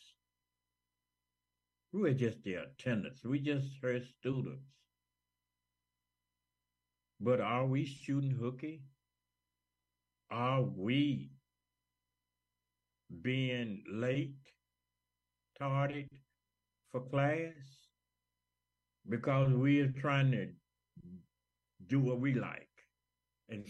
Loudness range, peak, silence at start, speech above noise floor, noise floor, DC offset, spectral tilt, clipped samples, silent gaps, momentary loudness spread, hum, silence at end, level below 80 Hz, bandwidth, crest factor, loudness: 6 LU; -20 dBFS; 1.95 s; over 55 dB; under -90 dBFS; under 0.1%; -8 dB/octave; under 0.1%; none; 14 LU; 60 Hz at -65 dBFS; 0 s; -74 dBFS; 8 kHz; 18 dB; -36 LUFS